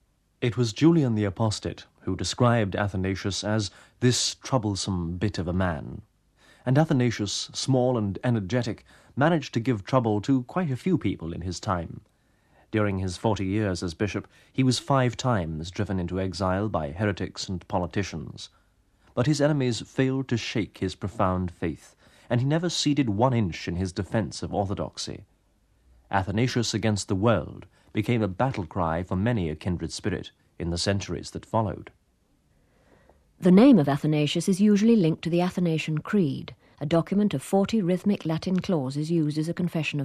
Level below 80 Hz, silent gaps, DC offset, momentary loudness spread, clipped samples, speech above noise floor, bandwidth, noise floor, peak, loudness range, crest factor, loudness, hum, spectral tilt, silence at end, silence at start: -52 dBFS; none; under 0.1%; 11 LU; under 0.1%; 41 dB; 13.5 kHz; -66 dBFS; -6 dBFS; 6 LU; 20 dB; -26 LUFS; none; -6 dB/octave; 0 s; 0.4 s